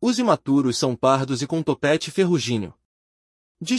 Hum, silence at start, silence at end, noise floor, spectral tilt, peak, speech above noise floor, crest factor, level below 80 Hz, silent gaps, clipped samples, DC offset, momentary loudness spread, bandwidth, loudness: none; 0 s; 0 s; under -90 dBFS; -5 dB/octave; -4 dBFS; over 69 dB; 18 dB; -62 dBFS; 2.85-3.55 s; under 0.1%; under 0.1%; 7 LU; 12 kHz; -21 LUFS